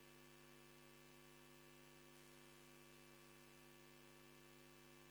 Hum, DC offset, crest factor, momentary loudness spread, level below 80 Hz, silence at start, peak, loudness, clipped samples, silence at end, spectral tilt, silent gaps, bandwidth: none; under 0.1%; 18 dB; 0 LU; -82 dBFS; 0 s; -48 dBFS; -64 LUFS; under 0.1%; 0 s; -3.5 dB/octave; none; over 20 kHz